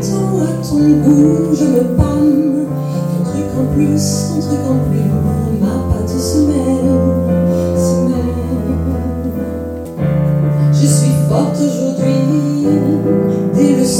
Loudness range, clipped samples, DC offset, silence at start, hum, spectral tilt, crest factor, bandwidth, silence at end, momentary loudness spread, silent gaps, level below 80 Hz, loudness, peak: 3 LU; under 0.1%; under 0.1%; 0 s; none; -7 dB/octave; 12 dB; 16.5 kHz; 0 s; 7 LU; none; -30 dBFS; -14 LUFS; 0 dBFS